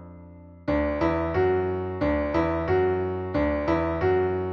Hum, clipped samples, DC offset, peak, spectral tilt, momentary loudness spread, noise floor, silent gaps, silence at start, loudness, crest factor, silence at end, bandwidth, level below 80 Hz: none; under 0.1%; under 0.1%; -12 dBFS; -9 dB/octave; 4 LU; -46 dBFS; none; 0 s; -25 LUFS; 14 dB; 0 s; 6.6 kHz; -40 dBFS